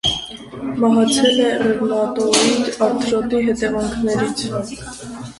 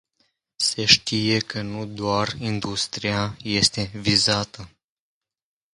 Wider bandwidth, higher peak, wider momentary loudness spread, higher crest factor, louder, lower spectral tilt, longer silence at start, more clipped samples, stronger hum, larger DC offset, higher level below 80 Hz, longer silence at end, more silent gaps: about the same, 11.5 kHz vs 11.5 kHz; about the same, 0 dBFS vs 0 dBFS; first, 15 LU vs 12 LU; second, 18 dB vs 24 dB; first, -17 LUFS vs -21 LUFS; about the same, -3.5 dB/octave vs -3 dB/octave; second, 0.05 s vs 0.6 s; neither; neither; neither; first, -44 dBFS vs -50 dBFS; second, 0.05 s vs 1.05 s; neither